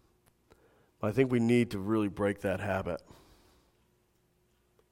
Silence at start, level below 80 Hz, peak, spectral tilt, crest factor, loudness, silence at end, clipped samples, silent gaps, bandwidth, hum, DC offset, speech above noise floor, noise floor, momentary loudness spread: 1 s; -62 dBFS; -12 dBFS; -7.5 dB/octave; 20 dB; -31 LUFS; 1.95 s; under 0.1%; none; 16 kHz; none; under 0.1%; 42 dB; -71 dBFS; 10 LU